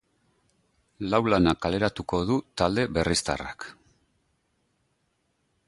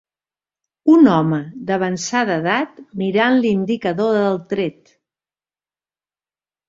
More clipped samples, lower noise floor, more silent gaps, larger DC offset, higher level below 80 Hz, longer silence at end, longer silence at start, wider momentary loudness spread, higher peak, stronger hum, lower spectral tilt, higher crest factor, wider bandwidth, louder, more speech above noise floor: neither; second, -73 dBFS vs under -90 dBFS; neither; neither; first, -46 dBFS vs -60 dBFS; about the same, 1.95 s vs 1.95 s; first, 1 s vs 0.85 s; first, 14 LU vs 11 LU; second, -6 dBFS vs -2 dBFS; second, none vs 50 Hz at -45 dBFS; about the same, -5 dB/octave vs -6 dB/octave; about the same, 22 dB vs 18 dB; first, 11.5 kHz vs 7.8 kHz; second, -26 LUFS vs -17 LUFS; second, 48 dB vs over 73 dB